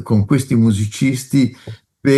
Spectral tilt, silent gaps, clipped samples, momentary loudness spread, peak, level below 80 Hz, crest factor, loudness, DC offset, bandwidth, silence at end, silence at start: -6.5 dB/octave; none; under 0.1%; 11 LU; -2 dBFS; -54 dBFS; 14 dB; -16 LUFS; under 0.1%; 12.5 kHz; 0 s; 0 s